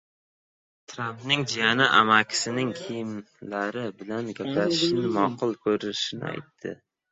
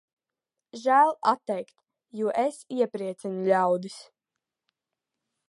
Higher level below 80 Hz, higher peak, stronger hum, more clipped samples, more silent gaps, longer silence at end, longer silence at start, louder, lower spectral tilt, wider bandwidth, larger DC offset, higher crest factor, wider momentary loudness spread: first, -66 dBFS vs -86 dBFS; first, -4 dBFS vs -8 dBFS; neither; neither; neither; second, 0.35 s vs 1.5 s; first, 0.9 s vs 0.75 s; about the same, -25 LUFS vs -26 LUFS; second, -3.5 dB/octave vs -5.5 dB/octave; second, 8.4 kHz vs 11.5 kHz; neither; about the same, 24 dB vs 20 dB; second, 17 LU vs 21 LU